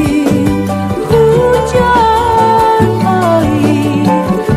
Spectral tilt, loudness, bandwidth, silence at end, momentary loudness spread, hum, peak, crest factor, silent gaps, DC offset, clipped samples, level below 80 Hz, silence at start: -6.5 dB/octave; -10 LUFS; 15.5 kHz; 0 s; 4 LU; none; 0 dBFS; 10 dB; none; under 0.1%; under 0.1%; -30 dBFS; 0 s